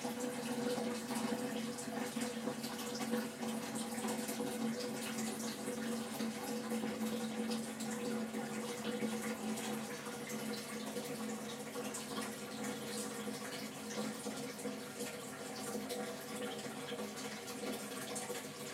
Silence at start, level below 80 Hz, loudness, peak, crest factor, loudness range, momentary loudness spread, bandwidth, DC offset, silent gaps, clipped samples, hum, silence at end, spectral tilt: 0 s; -80 dBFS; -41 LUFS; -24 dBFS; 18 dB; 3 LU; 4 LU; 16 kHz; under 0.1%; none; under 0.1%; none; 0 s; -3.5 dB/octave